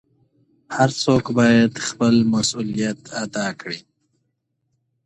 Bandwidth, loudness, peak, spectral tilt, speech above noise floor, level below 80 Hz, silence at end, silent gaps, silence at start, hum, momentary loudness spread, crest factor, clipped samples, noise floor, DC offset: 10.5 kHz; -19 LUFS; -2 dBFS; -5 dB/octave; 54 dB; -56 dBFS; 1.25 s; none; 0.7 s; none; 14 LU; 18 dB; under 0.1%; -73 dBFS; under 0.1%